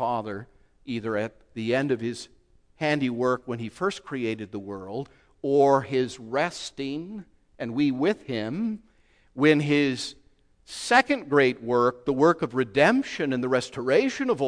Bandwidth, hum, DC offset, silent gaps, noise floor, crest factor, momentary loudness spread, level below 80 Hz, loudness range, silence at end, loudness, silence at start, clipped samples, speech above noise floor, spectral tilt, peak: 10.5 kHz; none; under 0.1%; none; -60 dBFS; 20 dB; 15 LU; -62 dBFS; 6 LU; 0 s; -25 LUFS; 0 s; under 0.1%; 35 dB; -5.5 dB/octave; -4 dBFS